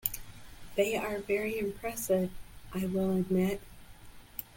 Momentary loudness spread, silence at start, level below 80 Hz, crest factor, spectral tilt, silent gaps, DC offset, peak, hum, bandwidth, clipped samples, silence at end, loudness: 14 LU; 0.05 s; -52 dBFS; 24 dB; -5.5 dB/octave; none; under 0.1%; -10 dBFS; none; 17 kHz; under 0.1%; 0 s; -33 LUFS